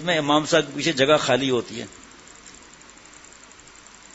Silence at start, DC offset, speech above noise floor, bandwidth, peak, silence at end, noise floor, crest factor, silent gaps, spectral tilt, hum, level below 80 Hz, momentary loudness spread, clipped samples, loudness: 0 s; under 0.1%; 26 dB; 8 kHz; -2 dBFS; 1.65 s; -47 dBFS; 22 dB; none; -3.5 dB/octave; none; -58 dBFS; 25 LU; under 0.1%; -20 LUFS